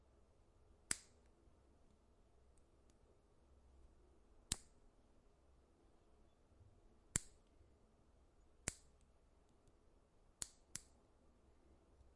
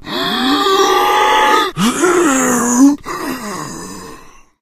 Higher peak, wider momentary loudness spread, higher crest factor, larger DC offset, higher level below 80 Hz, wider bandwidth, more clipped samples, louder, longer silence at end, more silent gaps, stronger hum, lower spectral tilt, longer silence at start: second, -16 dBFS vs 0 dBFS; second, 10 LU vs 14 LU; first, 40 dB vs 14 dB; neither; second, -68 dBFS vs -44 dBFS; second, 12 kHz vs 15.5 kHz; neither; second, -48 LUFS vs -12 LUFS; second, 0 s vs 0.3 s; neither; neither; second, -1.5 dB/octave vs -3 dB/octave; about the same, 0 s vs 0.05 s